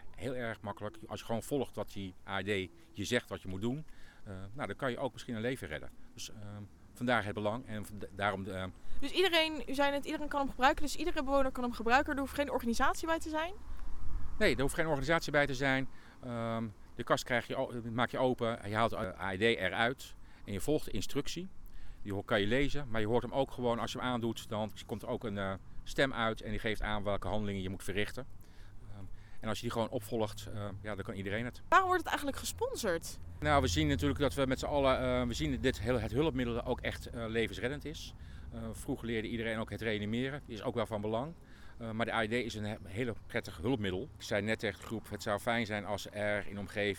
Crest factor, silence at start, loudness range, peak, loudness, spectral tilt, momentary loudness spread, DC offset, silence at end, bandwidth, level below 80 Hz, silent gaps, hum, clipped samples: 20 dB; 0 s; 6 LU; -14 dBFS; -35 LUFS; -5 dB/octave; 15 LU; under 0.1%; 0 s; 18 kHz; -48 dBFS; none; none; under 0.1%